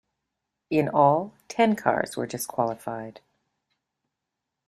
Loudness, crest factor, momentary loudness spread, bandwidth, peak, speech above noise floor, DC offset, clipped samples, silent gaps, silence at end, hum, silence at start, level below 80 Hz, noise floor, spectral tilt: -25 LUFS; 22 dB; 14 LU; 14 kHz; -6 dBFS; 60 dB; under 0.1%; under 0.1%; none; 1.55 s; none; 0.7 s; -68 dBFS; -84 dBFS; -5.5 dB/octave